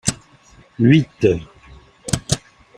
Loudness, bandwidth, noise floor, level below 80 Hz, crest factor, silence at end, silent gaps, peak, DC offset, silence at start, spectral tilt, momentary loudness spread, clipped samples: -19 LUFS; 15.5 kHz; -49 dBFS; -44 dBFS; 20 dB; 0.4 s; none; 0 dBFS; under 0.1%; 0.05 s; -5.5 dB/octave; 14 LU; under 0.1%